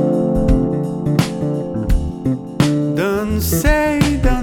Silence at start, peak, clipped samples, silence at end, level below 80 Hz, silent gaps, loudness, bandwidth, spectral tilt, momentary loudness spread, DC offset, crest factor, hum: 0 s; 0 dBFS; under 0.1%; 0 s; -22 dBFS; none; -17 LUFS; 20 kHz; -6 dB/octave; 6 LU; under 0.1%; 16 dB; none